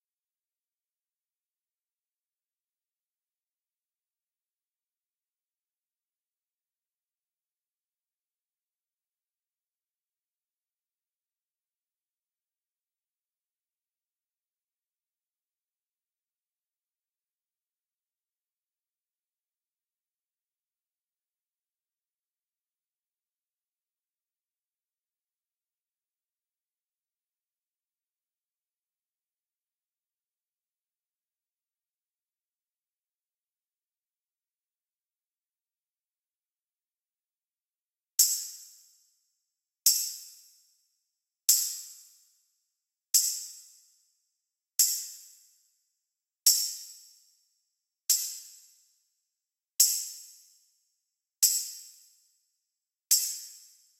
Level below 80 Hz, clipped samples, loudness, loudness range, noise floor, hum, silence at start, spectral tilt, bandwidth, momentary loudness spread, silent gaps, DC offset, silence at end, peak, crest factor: under -90 dBFS; under 0.1%; -26 LUFS; 3 LU; under -90 dBFS; none; 38.2 s; 10.5 dB/octave; 16 kHz; 20 LU; none; under 0.1%; 0.4 s; -6 dBFS; 34 dB